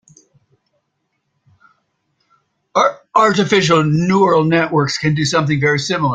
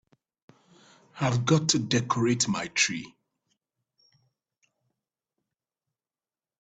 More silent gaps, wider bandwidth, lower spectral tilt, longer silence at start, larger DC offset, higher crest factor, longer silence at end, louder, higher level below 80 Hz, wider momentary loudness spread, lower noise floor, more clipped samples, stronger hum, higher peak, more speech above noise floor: neither; about the same, 9.2 kHz vs 9.4 kHz; first, -5.5 dB/octave vs -4 dB/octave; first, 2.75 s vs 1.15 s; neither; second, 16 dB vs 24 dB; second, 0 s vs 3.5 s; first, -14 LUFS vs -26 LUFS; first, -54 dBFS vs -64 dBFS; second, 4 LU vs 7 LU; second, -70 dBFS vs under -90 dBFS; neither; neither; first, 0 dBFS vs -6 dBFS; second, 56 dB vs over 64 dB